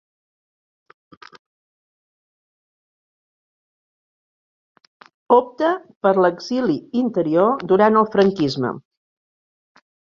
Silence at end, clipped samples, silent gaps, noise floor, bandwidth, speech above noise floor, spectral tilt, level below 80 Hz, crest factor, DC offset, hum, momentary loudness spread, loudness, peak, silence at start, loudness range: 1.35 s; under 0.1%; 5.96-6.01 s; under -90 dBFS; 7.2 kHz; over 72 dB; -7 dB/octave; -64 dBFS; 20 dB; under 0.1%; none; 7 LU; -18 LUFS; -2 dBFS; 5.3 s; 6 LU